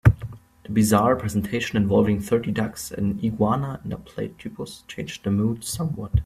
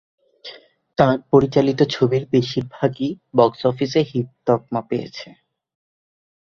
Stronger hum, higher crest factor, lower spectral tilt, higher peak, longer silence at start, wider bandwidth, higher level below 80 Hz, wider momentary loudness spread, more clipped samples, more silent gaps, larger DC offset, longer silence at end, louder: neither; about the same, 22 dB vs 20 dB; about the same, -6.5 dB/octave vs -7.5 dB/octave; about the same, -2 dBFS vs -2 dBFS; second, 0.05 s vs 0.45 s; first, 15.5 kHz vs 7.2 kHz; first, -38 dBFS vs -54 dBFS; second, 15 LU vs 18 LU; neither; neither; neither; second, 0 s vs 1.25 s; second, -24 LUFS vs -20 LUFS